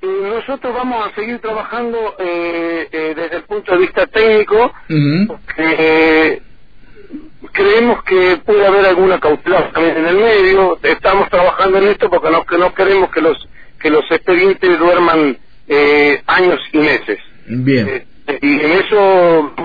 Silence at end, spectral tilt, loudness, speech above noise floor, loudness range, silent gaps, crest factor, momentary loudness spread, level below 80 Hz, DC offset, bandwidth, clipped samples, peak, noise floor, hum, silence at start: 0 s; -8 dB/octave; -12 LUFS; 30 dB; 4 LU; none; 12 dB; 11 LU; -40 dBFS; 2%; 5 kHz; under 0.1%; -2 dBFS; -42 dBFS; none; 0 s